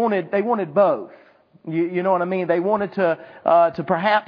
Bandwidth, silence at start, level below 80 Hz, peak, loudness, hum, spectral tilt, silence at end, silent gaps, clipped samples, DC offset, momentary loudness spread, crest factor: 5.2 kHz; 0 s; -68 dBFS; -4 dBFS; -20 LUFS; none; -9 dB/octave; 0.05 s; none; under 0.1%; under 0.1%; 9 LU; 16 dB